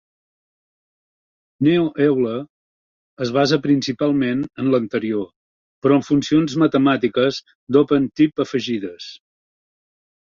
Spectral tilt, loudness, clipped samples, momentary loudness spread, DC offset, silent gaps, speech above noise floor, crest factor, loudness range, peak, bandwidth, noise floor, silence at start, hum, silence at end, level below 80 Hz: -6.5 dB/octave; -19 LUFS; under 0.1%; 10 LU; under 0.1%; 2.50-3.17 s, 5.36-5.82 s, 7.55-7.67 s; over 72 dB; 18 dB; 3 LU; -2 dBFS; 7.4 kHz; under -90 dBFS; 1.6 s; none; 1.1 s; -58 dBFS